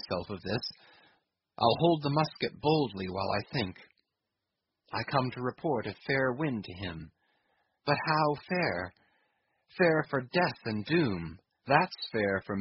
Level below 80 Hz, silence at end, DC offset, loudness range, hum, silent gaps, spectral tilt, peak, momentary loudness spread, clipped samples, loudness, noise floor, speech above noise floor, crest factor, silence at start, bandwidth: -62 dBFS; 0 s; under 0.1%; 4 LU; none; none; -4 dB/octave; -8 dBFS; 12 LU; under 0.1%; -31 LUFS; -86 dBFS; 56 dB; 24 dB; 0.05 s; 5.8 kHz